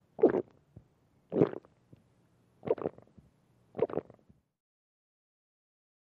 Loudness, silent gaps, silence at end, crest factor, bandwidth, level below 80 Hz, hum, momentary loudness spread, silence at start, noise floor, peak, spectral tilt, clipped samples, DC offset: -33 LUFS; none; 2.1 s; 26 dB; 4.4 kHz; -72 dBFS; none; 19 LU; 0.2 s; -68 dBFS; -10 dBFS; -10.5 dB/octave; under 0.1%; under 0.1%